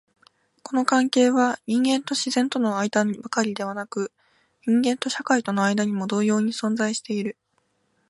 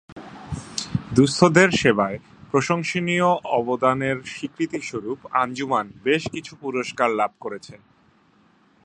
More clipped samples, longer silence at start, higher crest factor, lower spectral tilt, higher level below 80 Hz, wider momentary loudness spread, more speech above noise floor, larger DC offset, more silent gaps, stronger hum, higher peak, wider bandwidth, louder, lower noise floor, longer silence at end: neither; first, 0.65 s vs 0.1 s; about the same, 20 dB vs 22 dB; about the same, -4 dB/octave vs -5 dB/octave; second, -72 dBFS vs -52 dBFS; second, 10 LU vs 17 LU; first, 47 dB vs 37 dB; neither; second, none vs 0.12-0.16 s; neither; second, -4 dBFS vs 0 dBFS; about the same, 11.5 kHz vs 11.5 kHz; about the same, -23 LUFS vs -22 LUFS; first, -69 dBFS vs -58 dBFS; second, 0.8 s vs 1.1 s